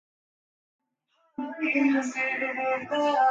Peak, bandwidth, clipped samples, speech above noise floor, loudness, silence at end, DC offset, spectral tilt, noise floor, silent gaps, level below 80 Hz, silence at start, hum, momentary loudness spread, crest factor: -12 dBFS; 7.8 kHz; under 0.1%; 45 dB; -26 LUFS; 0 s; under 0.1%; -3.5 dB/octave; -71 dBFS; none; -78 dBFS; 1.4 s; none; 14 LU; 16 dB